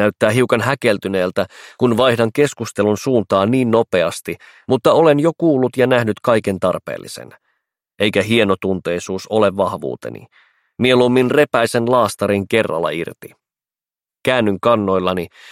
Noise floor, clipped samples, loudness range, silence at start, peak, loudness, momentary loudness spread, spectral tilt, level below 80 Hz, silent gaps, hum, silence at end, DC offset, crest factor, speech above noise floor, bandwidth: under -90 dBFS; under 0.1%; 3 LU; 0 s; 0 dBFS; -16 LUFS; 12 LU; -5.5 dB/octave; -56 dBFS; none; none; 0 s; under 0.1%; 16 dB; over 74 dB; 16 kHz